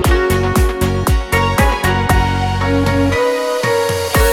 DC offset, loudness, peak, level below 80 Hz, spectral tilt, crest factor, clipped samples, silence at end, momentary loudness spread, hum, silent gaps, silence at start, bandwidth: 0.2%; -15 LUFS; 0 dBFS; -20 dBFS; -5.5 dB/octave; 14 dB; under 0.1%; 0 s; 2 LU; none; none; 0 s; 19 kHz